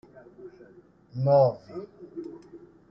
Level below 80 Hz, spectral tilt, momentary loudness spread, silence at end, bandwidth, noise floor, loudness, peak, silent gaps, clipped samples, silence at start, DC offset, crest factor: -68 dBFS; -10.5 dB/octave; 27 LU; 0.35 s; 5.8 kHz; -55 dBFS; -23 LUFS; -10 dBFS; none; under 0.1%; 0.4 s; under 0.1%; 20 dB